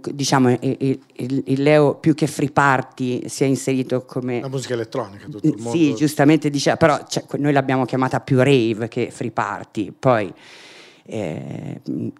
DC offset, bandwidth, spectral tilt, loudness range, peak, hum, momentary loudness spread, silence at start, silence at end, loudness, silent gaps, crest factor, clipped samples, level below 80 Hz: under 0.1%; 13.5 kHz; -6 dB/octave; 4 LU; 0 dBFS; none; 12 LU; 0.05 s; 0.1 s; -20 LUFS; none; 18 dB; under 0.1%; -60 dBFS